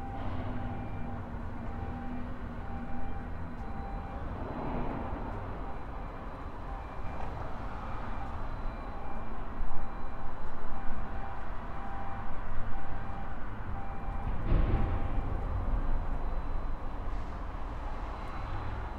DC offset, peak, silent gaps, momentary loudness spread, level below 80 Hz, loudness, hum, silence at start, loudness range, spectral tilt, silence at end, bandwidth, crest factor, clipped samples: under 0.1%; -12 dBFS; none; 6 LU; -36 dBFS; -40 LUFS; none; 0 s; 6 LU; -8.5 dB/octave; 0 s; 4.3 kHz; 16 dB; under 0.1%